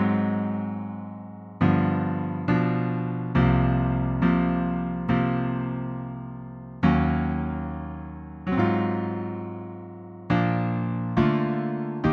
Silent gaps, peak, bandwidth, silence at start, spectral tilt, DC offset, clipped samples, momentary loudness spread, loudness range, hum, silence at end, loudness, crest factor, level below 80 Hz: none; -8 dBFS; 5.8 kHz; 0 s; -10 dB/octave; under 0.1%; under 0.1%; 15 LU; 4 LU; none; 0 s; -25 LUFS; 18 dB; -40 dBFS